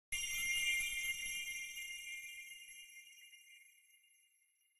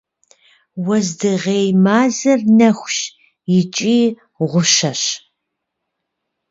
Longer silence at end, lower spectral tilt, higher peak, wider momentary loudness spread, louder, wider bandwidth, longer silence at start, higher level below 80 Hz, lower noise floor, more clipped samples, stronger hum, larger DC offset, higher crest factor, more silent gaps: second, 0.85 s vs 1.35 s; second, 3 dB/octave vs -4.5 dB/octave; second, -26 dBFS vs 0 dBFS; first, 23 LU vs 12 LU; second, -39 LUFS vs -15 LUFS; first, 15.5 kHz vs 7.8 kHz; second, 0.1 s vs 0.75 s; about the same, -66 dBFS vs -62 dBFS; about the same, -77 dBFS vs -76 dBFS; neither; neither; neither; about the same, 18 dB vs 16 dB; neither